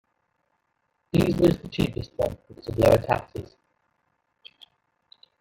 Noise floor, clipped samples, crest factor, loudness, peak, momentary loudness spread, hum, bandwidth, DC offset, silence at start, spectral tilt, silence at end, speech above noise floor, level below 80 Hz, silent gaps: -75 dBFS; under 0.1%; 20 dB; -24 LUFS; -6 dBFS; 17 LU; none; 17 kHz; under 0.1%; 1.15 s; -7 dB/octave; 2 s; 51 dB; -46 dBFS; none